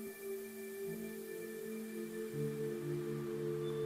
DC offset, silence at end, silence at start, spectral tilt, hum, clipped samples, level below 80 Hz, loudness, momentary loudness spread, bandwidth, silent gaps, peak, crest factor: under 0.1%; 0 s; 0 s; -6.5 dB/octave; none; under 0.1%; -76 dBFS; -43 LUFS; 5 LU; 16 kHz; none; -28 dBFS; 14 dB